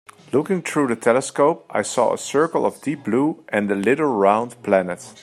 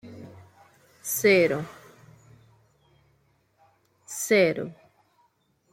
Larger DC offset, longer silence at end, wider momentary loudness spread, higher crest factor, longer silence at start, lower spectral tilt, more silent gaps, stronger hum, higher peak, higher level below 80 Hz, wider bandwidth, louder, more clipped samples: neither; second, 0.1 s vs 1 s; second, 6 LU vs 25 LU; about the same, 20 dB vs 22 dB; first, 0.35 s vs 0.05 s; about the same, -5 dB/octave vs -4 dB/octave; neither; neither; first, -2 dBFS vs -8 dBFS; about the same, -68 dBFS vs -70 dBFS; second, 13.5 kHz vs 16.5 kHz; first, -20 LUFS vs -24 LUFS; neither